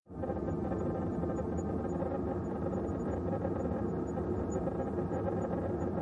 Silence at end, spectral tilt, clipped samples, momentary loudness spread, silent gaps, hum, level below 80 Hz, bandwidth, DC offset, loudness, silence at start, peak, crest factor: 0 s; -9.5 dB/octave; under 0.1%; 1 LU; none; none; -50 dBFS; 10.5 kHz; under 0.1%; -35 LUFS; 0.1 s; -20 dBFS; 14 dB